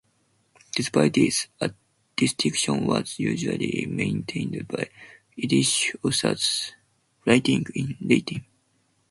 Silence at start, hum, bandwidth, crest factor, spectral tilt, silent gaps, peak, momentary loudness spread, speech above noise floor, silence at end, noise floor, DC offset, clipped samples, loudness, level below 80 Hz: 0.75 s; none; 12 kHz; 22 dB; -4 dB/octave; none; -4 dBFS; 11 LU; 44 dB; 0.7 s; -68 dBFS; under 0.1%; under 0.1%; -24 LUFS; -60 dBFS